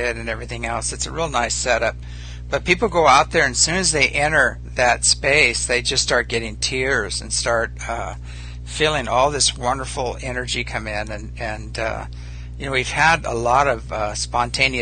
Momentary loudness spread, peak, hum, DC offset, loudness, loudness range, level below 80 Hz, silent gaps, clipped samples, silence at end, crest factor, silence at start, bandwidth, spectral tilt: 14 LU; -2 dBFS; 60 Hz at -35 dBFS; under 0.1%; -19 LUFS; 6 LU; -34 dBFS; none; under 0.1%; 0 s; 18 dB; 0 s; 9.6 kHz; -2.5 dB/octave